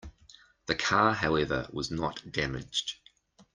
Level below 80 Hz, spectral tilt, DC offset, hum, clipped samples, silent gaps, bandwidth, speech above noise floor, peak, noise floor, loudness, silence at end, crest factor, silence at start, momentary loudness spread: -52 dBFS; -4 dB/octave; under 0.1%; none; under 0.1%; none; 10 kHz; 32 dB; -10 dBFS; -61 dBFS; -30 LUFS; 0.6 s; 22 dB; 0.05 s; 12 LU